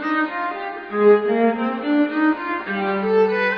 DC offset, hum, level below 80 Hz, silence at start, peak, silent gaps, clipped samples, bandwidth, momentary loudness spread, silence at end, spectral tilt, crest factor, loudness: under 0.1%; none; -62 dBFS; 0 s; -4 dBFS; none; under 0.1%; 5.4 kHz; 10 LU; 0 s; -8 dB/octave; 16 dB; -20 LUFS